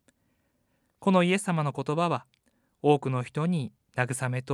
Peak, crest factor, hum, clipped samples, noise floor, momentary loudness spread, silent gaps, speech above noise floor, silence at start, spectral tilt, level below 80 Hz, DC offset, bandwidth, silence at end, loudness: -8 dBFS; 20 dB; none; under 0.1%; -72 dBFS; 8 LU; none; 46 dB; 1 s; -6 dB/octave; -74 dBFS; under 0.1%; 13 kHz; 0 s; -28 LUFS